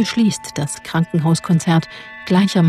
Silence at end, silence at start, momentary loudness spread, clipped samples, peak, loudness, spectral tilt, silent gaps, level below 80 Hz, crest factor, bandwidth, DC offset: 0 s; 0 s; 8 LU; under 0.1%; -4 dBFS; -18 LUFS; -6 dB/octave; none; -54 dBFS; 12 dB; 13.5 kHz; under 0.1%